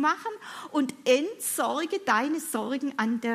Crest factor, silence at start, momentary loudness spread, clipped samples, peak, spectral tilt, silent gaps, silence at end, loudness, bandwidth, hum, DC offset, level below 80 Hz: 18 dB; 0 s; 7 LU; under 0.1%; -10 dBFS; -3 dB/octave; none; 0 s; -28 LUFS; 15.5 kHz; none; under 0.1%; -82 dBFS